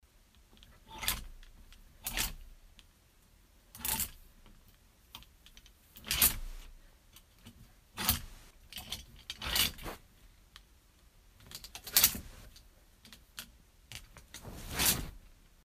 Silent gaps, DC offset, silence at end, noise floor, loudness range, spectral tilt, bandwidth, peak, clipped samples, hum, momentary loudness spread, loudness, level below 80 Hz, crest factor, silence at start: none; under 0.1%; 0.3 s; -64 dBFS; 7 LU; -1 dB/octave; 15.5 kHz; -4 dBFS; under 0.1%; none; 26 LU; -32 LUFS; -52 dBFS; 36 dB; 0.5 s